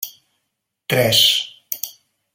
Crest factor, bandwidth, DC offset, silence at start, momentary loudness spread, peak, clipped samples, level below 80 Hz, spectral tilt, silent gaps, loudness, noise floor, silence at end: 20 dB; 17 kHz; under 0.1%; 0 s; 18 LU; -2 dBFS; under 0.1%; -62 dBFS; -2.5 dB/octave; none; -16 LUFS; -76 dBFS; 0.45 s